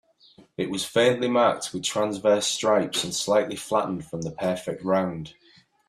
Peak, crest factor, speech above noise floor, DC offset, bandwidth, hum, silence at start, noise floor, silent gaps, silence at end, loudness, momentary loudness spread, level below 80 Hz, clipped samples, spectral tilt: -6 dBFS; 18 dB; 31 dB; under 0.1%; 14 kHz; none; 0.4 s; -55 dBFS; none; 0.55 s; -24 LUFS; 10 LU; -62 dBFS; under 0.1%; -3.5 dB/octave